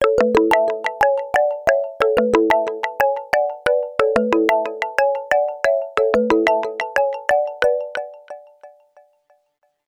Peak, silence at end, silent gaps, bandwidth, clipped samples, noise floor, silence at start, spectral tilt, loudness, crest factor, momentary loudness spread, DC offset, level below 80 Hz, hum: 0 dBFS; 1.2 s; none; 17.5 kHz; under 0.1%; -67 dBFS; 0 s; -4.5 dB/octave; -18 LUFS; 18 dB; 6 LU; under 0.1%; -50 dBFS; none